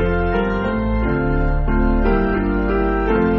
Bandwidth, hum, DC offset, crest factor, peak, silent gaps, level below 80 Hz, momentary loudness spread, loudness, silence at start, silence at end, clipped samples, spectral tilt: 5.4 kHz; none; under 0.1%; 12 dB; -4 dBFS; none; -22 dBFS; 2 LU; -19 LUFS; 0 s; 0 s; under 0.1%; -7 dB/octave